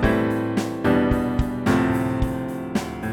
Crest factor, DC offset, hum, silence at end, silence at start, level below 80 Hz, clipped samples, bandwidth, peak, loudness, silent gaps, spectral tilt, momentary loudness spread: 16 dB; under 0.1%; none; 0 s; 0 s; -32 dBFS; under 0.1%; 17.5 kHz; -4 dBFS; -23 LUFS; none; -7 dB/octave; 7 LU